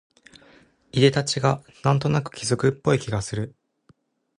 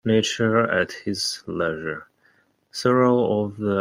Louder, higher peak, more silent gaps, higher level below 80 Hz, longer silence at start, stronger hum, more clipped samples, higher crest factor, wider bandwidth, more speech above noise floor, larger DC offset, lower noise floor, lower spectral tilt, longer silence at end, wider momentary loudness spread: about the same, -23 LUFS vs -22 LUFS; about the same, -4 dBFS vs -6 dBFS; neither; first, -52 dBFS vs -62 dBFS; first, 0.95 s vs 0.05 s; neither; neither; about the same, 20 dB vs 18 dB; second, 11 kHz vs 16 kHz; about the same, 39 dB vs 40 dB; neither; about the same, -61 dBFS vs -62 dBFS; about the same, -5.5 dB/octave vs -5 dB/octave; first, 0.9 s vs 0 s; about the same, 10 LU vs 12 LU